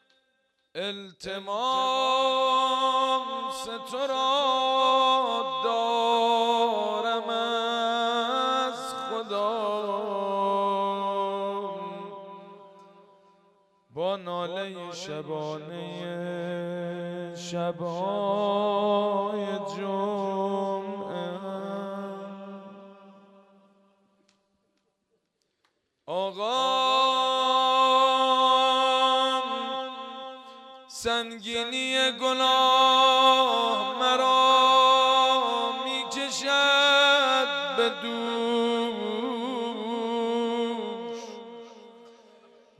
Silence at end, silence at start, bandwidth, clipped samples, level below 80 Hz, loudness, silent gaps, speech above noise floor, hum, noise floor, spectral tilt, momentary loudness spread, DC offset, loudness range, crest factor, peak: 0.7 s; 0.75 s; 13.5 kHz; under 0.1%; -74 dBFS; -25 LUFS; none; 50 dB; none; -76 dBFS; -3 dB/octave; 17 LU; under 0.1%; 14 LU; 18 dB; -8 dBFS